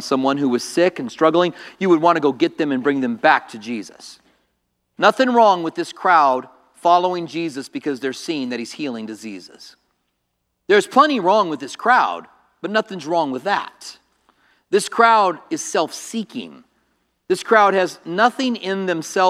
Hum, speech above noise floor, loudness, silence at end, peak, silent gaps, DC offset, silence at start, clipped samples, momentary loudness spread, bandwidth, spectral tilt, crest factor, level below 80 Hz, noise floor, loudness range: none; 55 dB; -18 LUFS; 0 s; 0 dBFS; none; under 0.1%; 0 s; under 0.1%; 15 LU; 14.5 kHz; -4 dB/octave; 18 dB; -74 dBFS; -73 dBFS; 5 LU